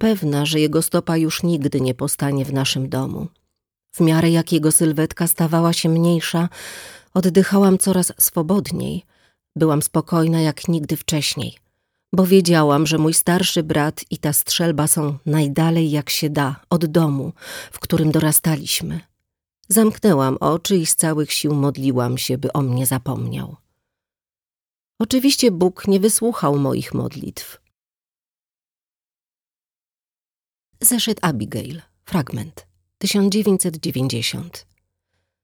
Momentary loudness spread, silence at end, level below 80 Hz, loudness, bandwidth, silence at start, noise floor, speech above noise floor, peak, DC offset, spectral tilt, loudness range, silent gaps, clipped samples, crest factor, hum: 13 LU; 0.8 s; -52 dBFS; -18 LUFS; over 20 kHz; 0 s; under -90 dBFS; over 72 dB; -2 dBFS; under 0.1%; -4.5 dB/octave; 5 LU; 24.71-24.75 s, 28.71-28.76 s; under 0.1%; 18 dB; none